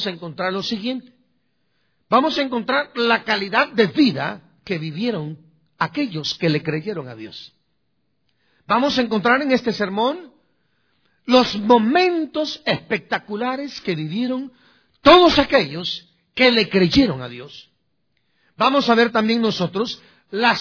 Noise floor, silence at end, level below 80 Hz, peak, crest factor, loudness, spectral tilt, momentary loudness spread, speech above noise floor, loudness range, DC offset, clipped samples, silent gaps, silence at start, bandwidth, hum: -72 dBFS; 0 s; -50 dBFS; 0 dBFS; 20 dB; -19 LUFS; -5.5 dB/octave; 15 LU; 53 dB; 8 LU; under 0.1%; under 0.1%; none; 0 s; 5.4 kHz; none